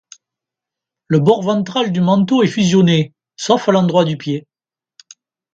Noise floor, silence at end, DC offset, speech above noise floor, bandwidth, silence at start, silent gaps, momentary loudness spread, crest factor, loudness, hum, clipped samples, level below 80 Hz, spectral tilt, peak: under -90 dBFS; 1.15 s; under 0.1%; over 76 dB; 7.8 kHz; 1.1 s; none; 11 LU; 16 dB; -15 LUFS; none; under 0.1%; -58 dBFS; -6.5 dB/octave; 0 dBFS